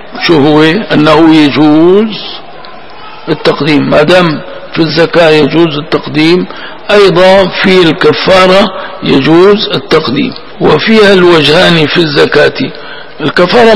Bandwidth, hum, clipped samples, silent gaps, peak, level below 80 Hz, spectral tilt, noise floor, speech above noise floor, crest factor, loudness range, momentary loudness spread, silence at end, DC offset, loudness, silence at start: 11 kHz; none; 7%; none; 0 dBFS; -38 dBFS; -6 dB/octave; -28 dBFS; 22 dB; 6 dB; 3 LU; 12 LU; 0 s; 5%; -6 LUFS; 0 s